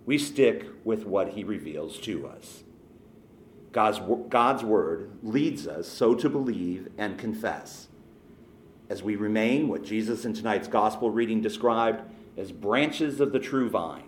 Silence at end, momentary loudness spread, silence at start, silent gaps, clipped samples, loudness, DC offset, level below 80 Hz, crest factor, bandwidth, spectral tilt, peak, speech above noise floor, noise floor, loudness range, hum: 0 s; 12 LU; 0.05 s; none; under 0.1%; -27 LUFS; under 0.1%; -64 dBFS; 20 dB; 17.5 kHz; -5.5 dB/octave; -8 dBFS; 25 dB; -52 dBFS; 5 LU; none